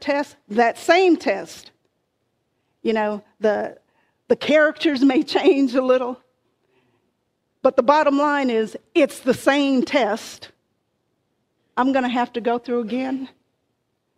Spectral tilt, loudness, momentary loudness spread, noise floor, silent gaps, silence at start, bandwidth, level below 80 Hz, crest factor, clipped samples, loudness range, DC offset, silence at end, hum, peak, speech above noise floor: -4.5 dB/octave; -20 LUFS; 12 LU; -72 dBFS; none; 0 s; 14.5 kHz; -66 dBFS; 20 dB; under 0.1%; 6 LU; under 0.1%; 0.9 s; none; 0 dBFS; 53 dB